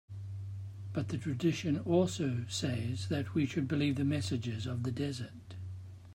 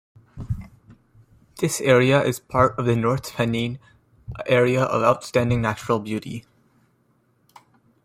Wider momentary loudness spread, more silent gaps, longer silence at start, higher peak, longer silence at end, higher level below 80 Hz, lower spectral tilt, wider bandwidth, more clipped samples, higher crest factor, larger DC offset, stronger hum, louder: about the same, 14 LU vs 15 LU; neither; second, 0.1 s vs 0.35 s; second, -16 dBFS vs -2 dBFS; second, 0 s vs 1.65 s; second, -66 dBFS vs -48 dBFS; about the same, -6 dB/octave vs -5.5 dB/octave; about the same, 16 kHz vs 16 kHz; neither; about the same, 18 dB vs 20 dB; neither; neither; second, -35 LUFS vs -21 LUFS